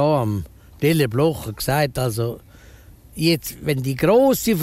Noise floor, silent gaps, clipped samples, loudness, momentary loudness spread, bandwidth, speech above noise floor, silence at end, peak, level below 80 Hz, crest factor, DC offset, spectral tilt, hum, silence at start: -45 dBFS; none; under 0.1%; -20 LUFS; 12 LU; 16 kHz; 26 dB; 0 s; -6 dBFS; -44 dBFS; 14 dB; under 0.1%; -5.5 dB/octave; none; 0 s